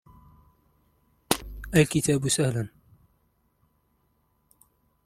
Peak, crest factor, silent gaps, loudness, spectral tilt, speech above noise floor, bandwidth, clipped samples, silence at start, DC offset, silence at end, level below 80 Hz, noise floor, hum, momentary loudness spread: -2 dBFS; 28 dB; none; -25 LUFS; -4.5 dB/octave; 46 dB; 16.5 kHz; under 0.1%; 1.3 s; under 0.1%; 2.4 s; -50 dBFS; -70 dBFS; 50 Hz at -45 dBFS; 9 LU